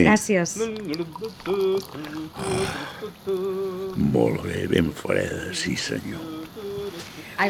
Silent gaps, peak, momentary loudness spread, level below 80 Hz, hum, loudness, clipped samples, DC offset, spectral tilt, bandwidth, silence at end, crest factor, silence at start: none; -4 dBFS; 12 LU; -52 dBFS; none; -26 LUFS; under 0.1%; under 0.1%; -5 dB/octave; 17.5 kHz; 0 s; 22 dB; 0 s